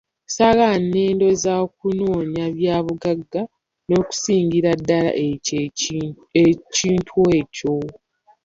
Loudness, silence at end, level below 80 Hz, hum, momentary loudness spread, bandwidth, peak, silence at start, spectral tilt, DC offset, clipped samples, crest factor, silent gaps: -19 LUFS; 0.55 s; -50 dBFS; none; 8 LU; 7.8 kHz; -2 dBFS; 0.3 s; -5 dB/octave; under 0.1%; under 0.1%; 16 dB; none